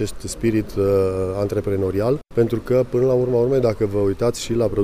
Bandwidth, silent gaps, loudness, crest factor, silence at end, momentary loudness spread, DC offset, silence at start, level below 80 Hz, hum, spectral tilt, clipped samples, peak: 15.5 kHz; none; -20 LUFS; 14 dB; 0 s; 4 LU; under 0.1%; 0 s; -40 dBFS; none; -7 dB/octave; under 0.1%; -6 dBFS